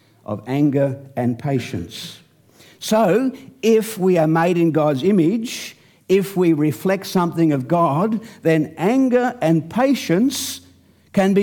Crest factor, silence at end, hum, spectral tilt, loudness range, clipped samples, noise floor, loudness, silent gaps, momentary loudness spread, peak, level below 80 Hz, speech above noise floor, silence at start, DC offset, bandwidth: 12 dB; 0 s; none; -6 dB/octave; 3 LU; under 0.1%; -52 dBFS; -19 LUFS; none; 12 LU; -6 dBFS; -60 dBFS; 34 dB; 0.3 s; under 0.1%; 19 kHz